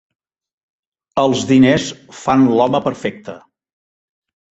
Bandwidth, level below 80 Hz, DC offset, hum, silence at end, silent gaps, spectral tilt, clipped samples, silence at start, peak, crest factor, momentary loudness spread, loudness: 8 kHz; -52 dBFS; under 0.1%; none; 1.2 s; none; -5.5 dB/octave; under 0.1%; 1.15 s; 0 dBFS; 18 dB; 15 LU; -15 LUFS